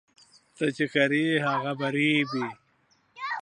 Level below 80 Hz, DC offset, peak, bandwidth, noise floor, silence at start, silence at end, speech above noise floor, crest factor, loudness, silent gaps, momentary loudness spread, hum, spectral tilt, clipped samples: -78 dBFS; under 0.1%; -8 dBFS; 10 kHz; -67 dBFS; 0.6 s; 0 s; 41 dB; 20 dB; -26 LUFS; none; 10 LU; none; -5.5 dB/octave; under 0.1%